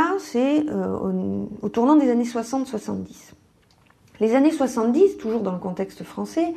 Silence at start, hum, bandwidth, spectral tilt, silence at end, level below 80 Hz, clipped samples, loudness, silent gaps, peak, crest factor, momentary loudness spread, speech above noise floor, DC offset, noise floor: 0 s; none; 13.5 kHz; -6.5 dB/octave; 0 s; -60 dBFS; under 0.1%; -22 LUFS; none; -6 dBFS; 16 dB; 12 LU; 36 dB; under 0.1%; -58 dBFS